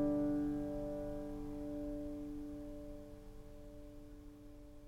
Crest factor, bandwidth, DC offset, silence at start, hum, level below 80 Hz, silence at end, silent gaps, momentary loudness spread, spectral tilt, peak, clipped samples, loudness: 16 dB; 14.5 kHz; under 0.1%; 0 s; none; -54 dBFS; 0 s; none; 19 LU; -8.5 dB/octave; -26 dBFS; under 0.1%; -43 LUFS